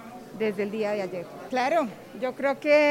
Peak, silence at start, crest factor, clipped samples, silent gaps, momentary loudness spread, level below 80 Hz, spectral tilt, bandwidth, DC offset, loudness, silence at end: -10 dBFS; 0 s; 16 dB; under 0.1%; none; 12 LU; -68 dBFS; -5 dB/octave; 16 kHz; under 0.1%; -27 LUFS; 0 s